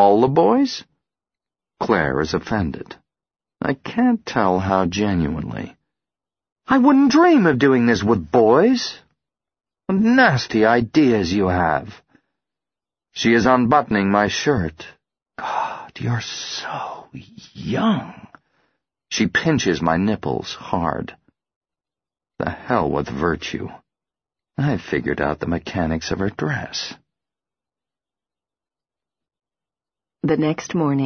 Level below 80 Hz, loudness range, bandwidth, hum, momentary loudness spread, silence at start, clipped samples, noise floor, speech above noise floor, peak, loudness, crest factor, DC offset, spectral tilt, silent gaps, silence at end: -46 dBFS; 10 LU; 6.6 kHz; none; 15 LU; 0 s; under 0.1%; under -90 dBFS; over 72 dB; 0 dBFS; -19 LUFS; 20 dB; under 0.1%; -6 dB/octave; 6.52-6.56 s, 21.56-21.61 s; 0 s